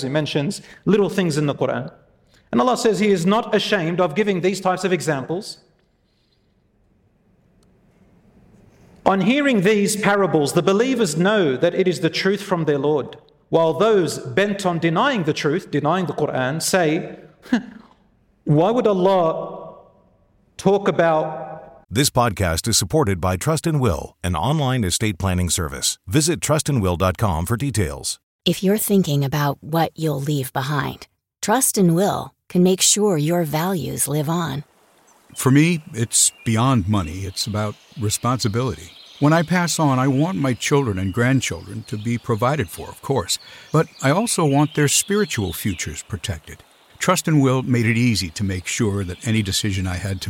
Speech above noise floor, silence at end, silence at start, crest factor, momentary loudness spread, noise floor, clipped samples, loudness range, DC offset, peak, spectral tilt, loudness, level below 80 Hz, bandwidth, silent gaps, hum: 43 dB; 0 s; 0 s; 18 dB; 10 LU; -63 dBFS; under 0.1%; 3 LU; under 0.1%; -2 dBFS; -4.5 dB/octave; -20 LUFS; -46 dBFS; 17 kHz; 28.23-28.39 s; none